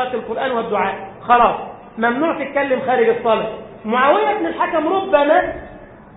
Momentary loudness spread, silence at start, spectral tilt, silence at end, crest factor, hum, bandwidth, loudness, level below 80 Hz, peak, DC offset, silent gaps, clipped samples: 14 LU; 0 s; -10 dB/octave; 0 s; 16 dB; none; 4 kHz; -17 LUFS; -50 dBFS; 0 dBFS; under 0.1%; none; under 0.1%